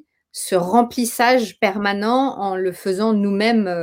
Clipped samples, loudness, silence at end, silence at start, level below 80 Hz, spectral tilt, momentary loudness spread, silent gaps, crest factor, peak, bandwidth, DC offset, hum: under 0.1%; -19 LUFS; 0 s; 0.35 s; -60 dBFS; -4.5 dB/octave; 6 LU; none; 18 dB; 0 dBFS; 17 kHz; under 0.1%; none